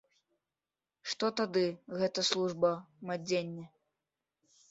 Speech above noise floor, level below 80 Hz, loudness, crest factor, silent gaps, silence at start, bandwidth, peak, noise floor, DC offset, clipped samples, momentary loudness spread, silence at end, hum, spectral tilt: over 57 dB; -78 dBFS; -33 LUFS; 24 dB; none; 1.05 s; 8.2 kHz; -12 dBFS; under -90 dBFS; under 0.1%; under 0.1%; 11 LU; 1.05 s; none; -4 dB/octave